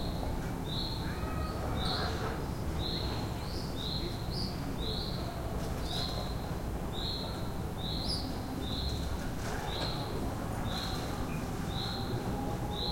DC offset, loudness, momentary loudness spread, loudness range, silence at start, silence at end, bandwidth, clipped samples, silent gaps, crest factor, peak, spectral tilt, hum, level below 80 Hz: under 0.1%; -36 LUFS; 3 LU; 1 LU; 0 s; 0 s; 16.5 kHz; under 0.1%; none; 16 dB; -20 dBFS; -5.5 dB/octave; none; -42 dBFS